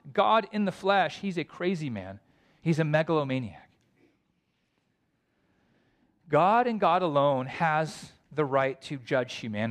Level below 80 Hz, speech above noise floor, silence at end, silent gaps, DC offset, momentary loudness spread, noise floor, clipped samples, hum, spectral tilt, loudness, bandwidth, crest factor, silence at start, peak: -70 dBFS; 48 dB; 0 s; none; under 0.1%; 12 LU; -74 dBFS; under 0.1%; none; -6.5 dB/octave; -27 LUFS; 11.5 kHz; 18 dB; 0.05 s; -10 dBFS